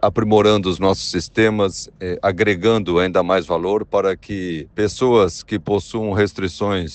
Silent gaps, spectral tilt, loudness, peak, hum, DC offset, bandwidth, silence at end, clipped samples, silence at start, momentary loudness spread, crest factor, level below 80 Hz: none; -5.5 dB/octave; -18 LUFS; -2 dBFS; none; under 0.1%; 9 kHz; 0 s; under 0.1%; 0 s; 9 LU; 16 dB; -46 dBFS